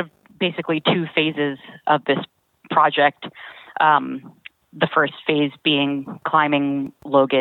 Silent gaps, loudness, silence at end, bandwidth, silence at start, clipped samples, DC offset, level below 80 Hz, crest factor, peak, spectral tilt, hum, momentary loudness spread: none; -20 LUFS; 0 s; 4.3 kHz; 0 s; under 0.1%; under 0.1%; -70 dBFS; 18 dB; -2 dBFS; -8 dB/octave; none; 15 LU